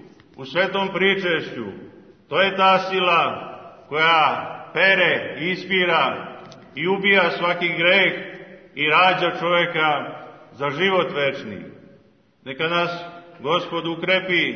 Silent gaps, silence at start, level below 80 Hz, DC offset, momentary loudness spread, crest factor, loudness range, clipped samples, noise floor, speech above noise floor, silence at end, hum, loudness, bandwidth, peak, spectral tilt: none; 0.05 s; -68 dBFS; under 0.1%; 19 LU; 20 dB; 6 LU; under 0.1%; -55 dBFS; 35 dB; 0 s; none; -19 LUFS; 6.6 kHz; -2 dBFS; -5.5 dB/octave